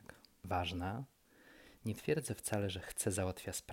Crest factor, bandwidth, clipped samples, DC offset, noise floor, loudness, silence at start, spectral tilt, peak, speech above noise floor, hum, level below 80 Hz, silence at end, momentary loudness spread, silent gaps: 18 dB; 16.5 kHz; under 0.1%; under 0.1%; -63 dBFS; -40 LUFS; 0.1 s; -4.5 dB/octave; -22 dBFS; 24 dB; none; -62 dBFS; 0 s; 17 LU; none